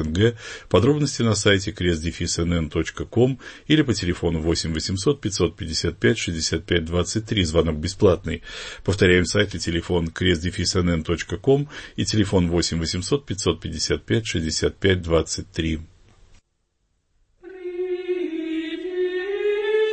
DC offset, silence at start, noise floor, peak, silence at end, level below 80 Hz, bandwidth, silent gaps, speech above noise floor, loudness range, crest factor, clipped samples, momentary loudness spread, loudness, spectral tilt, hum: under 0.1%; 0 s; -71 dBFS; -4 dBFS; 0 s; -40 dBFS; 8.8 kHz; none; 49 dB; 6 LU; 18 dB; under 0.1%; 8 LU; -22 LUFS; -5 dB/octave; none